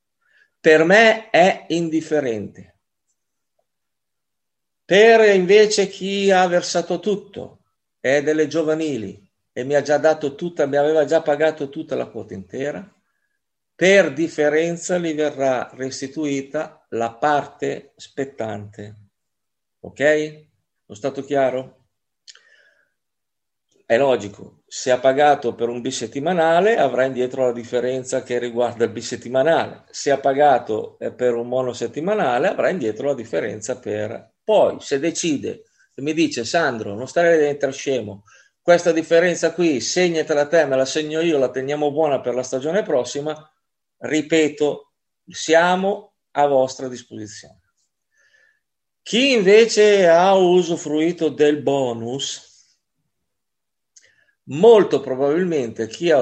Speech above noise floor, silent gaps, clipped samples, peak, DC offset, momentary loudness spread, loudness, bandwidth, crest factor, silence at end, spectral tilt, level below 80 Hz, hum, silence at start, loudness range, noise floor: 66 dB; none; under 0.1%; 0 dBFS; under 0.1%; 16 LU; -19 LUFS; 8.8 kHz; 20 dB; 0 s; -4.5 dB/octave; -70 dBFS; none; 0.65 s; 9 LU; -84 dBFS